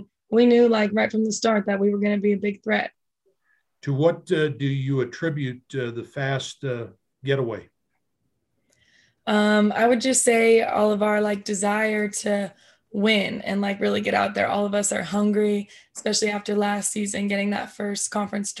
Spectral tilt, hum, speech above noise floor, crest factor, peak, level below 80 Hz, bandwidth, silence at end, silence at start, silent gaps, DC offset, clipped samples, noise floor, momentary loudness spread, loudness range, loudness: -4.5 dB/octave; none; 55 dB; 18 dB; -6 dBFS; -66 dBFS; 12.5 kHz; 0 s; 0 s; none; under 0.1%; under 0.1%; -77 dBFS; 12 LU; 8 LU; -23 LUFS